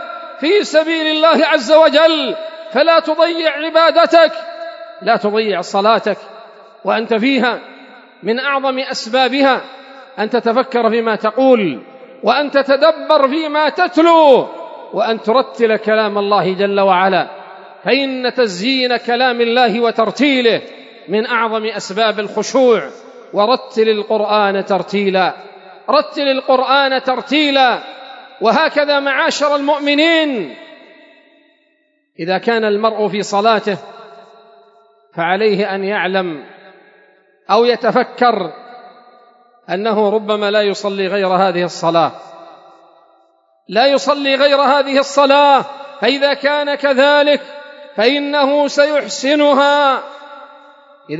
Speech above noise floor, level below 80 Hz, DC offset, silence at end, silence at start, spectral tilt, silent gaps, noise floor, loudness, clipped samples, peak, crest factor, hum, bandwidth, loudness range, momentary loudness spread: 47 dB; -76 dBFS; under 0.1%; 0 s; 0 s; -4 dB/octave; none; -60 dBFS; -14 LUFS; under 0.1%; 0 dBFS; 14 dB; none; 8 kHz; 5 LU; 12 LU